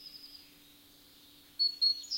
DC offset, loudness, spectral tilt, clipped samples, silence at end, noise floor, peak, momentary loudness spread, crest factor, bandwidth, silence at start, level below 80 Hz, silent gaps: under 0.1%; -29 LUFS; 1 dB/octave; under 0.1%; 0 s; -59 dBFS; -20 dBFS; 24 LU; 16 dB; 16.5 kHz; 0 s; -76 dBFS; none